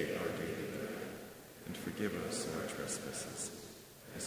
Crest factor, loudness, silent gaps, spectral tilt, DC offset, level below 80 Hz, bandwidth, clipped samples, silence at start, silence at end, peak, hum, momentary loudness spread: 20 dB; -41 LUFS; none; -3.5 dB/octave; under 0.1%; -64 dBFS; 16 kHz; under 0.1%; 0 s; 0 s; -22 dBFS; none; 12 LU